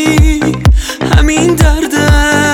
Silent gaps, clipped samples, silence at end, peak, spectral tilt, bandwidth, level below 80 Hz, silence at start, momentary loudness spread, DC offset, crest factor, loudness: none; under 0.1%; 0 s; 0 dBFS; -5 dB/octave; 17 kHz; -12 dBFS; 0 s; 3 LU; under 0.1%; 8 dB; -10 LUFS